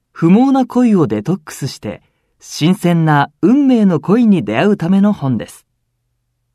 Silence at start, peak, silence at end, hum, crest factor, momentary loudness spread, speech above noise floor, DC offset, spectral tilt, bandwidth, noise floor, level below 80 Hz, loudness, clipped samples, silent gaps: 0.15 s; 0 dBFS; 1.05 s; none; 14 dB; 14 LU; 55 dB; under 0.1%; -7 dB/octave; 13.5 kHz; -67 dBFS; -56 dBFS; -13 LUFS; under 0.1%; none